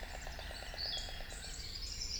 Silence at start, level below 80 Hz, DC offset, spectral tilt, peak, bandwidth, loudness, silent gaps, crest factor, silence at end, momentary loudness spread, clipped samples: 0 s; -48 dBFS; under 0.1%; -1.5 dB/octave; -28 dBFS; over 20 kHz; -43 LUFS; none; 16 dB; 0 s; 7 LU; under 0.1%